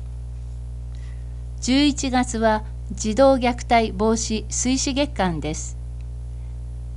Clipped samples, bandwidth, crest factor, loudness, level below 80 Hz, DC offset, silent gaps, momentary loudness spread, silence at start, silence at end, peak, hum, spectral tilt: under 0.1%; 11.5 kHz; 18 dB; -21 LUFS; -32 dBFS; under 0.1%; none; 16 LU; 0 s; 0 s; -6 dBFS; 60 Hz at -30 dBFS; -4.5 dB/octave